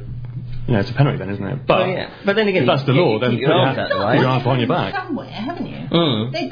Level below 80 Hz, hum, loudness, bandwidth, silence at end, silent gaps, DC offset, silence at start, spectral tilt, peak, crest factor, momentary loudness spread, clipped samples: -40 dBFS; none; -18 LUFS; 5.2 kHz; 0 s; none; under 0.1%; 0 s; -8 dB/octave; -2 dBFS; 18 dB; 11 LU; under 0.1%